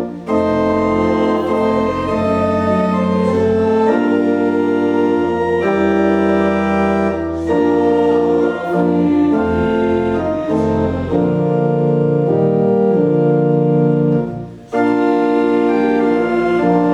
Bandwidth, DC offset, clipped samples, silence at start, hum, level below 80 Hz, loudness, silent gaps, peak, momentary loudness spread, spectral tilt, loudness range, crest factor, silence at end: 9.2 kHz; under 0.1%; under 0.1%; 0 s; none; -40 dBFS; -15 LUFS; none; -2 dBFS; 3 LU; -8.5 dB/octave; 1 LU; 12 dB; 0 s